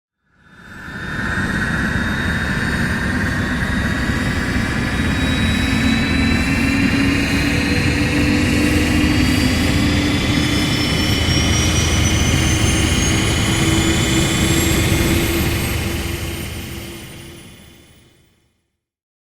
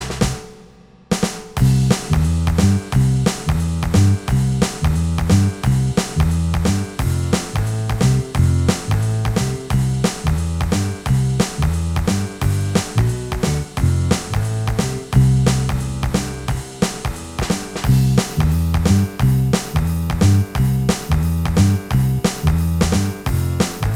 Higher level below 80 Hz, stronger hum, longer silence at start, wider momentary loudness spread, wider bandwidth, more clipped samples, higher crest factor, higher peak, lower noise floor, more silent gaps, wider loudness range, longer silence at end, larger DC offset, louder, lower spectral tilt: about the same, -28 dBFS vs -26 dBFS; neither; first, 0.6 s vs 0 s; about the same, 8 LU vs 6 LU; first, 19.5 kHz vs 16.5 kHz; neither; about the same, 14 dB vs 16 dB; about the same, -2 dBFS vs 0 dBFS; first, -71 dBFS vs -45 dBFS; neither; first, 5 LU vs 2 LU; first, 1.7 s vs 0 s; second, under 0.1% vs 0.1%; about the same, -17 LUFS vs -18 LUFS; second, -4.5 dB/octave vs -6 dB/octave